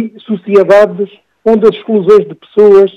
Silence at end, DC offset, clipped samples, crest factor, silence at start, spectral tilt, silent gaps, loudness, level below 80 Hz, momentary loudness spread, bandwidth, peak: 0.05 s; under 0.1%; 3%; 8 dB; 0 s; -7.5 dB/octave; none; -9 LUFS; -50 dBFS; 13 LU; 7 kHz; 0 dBFS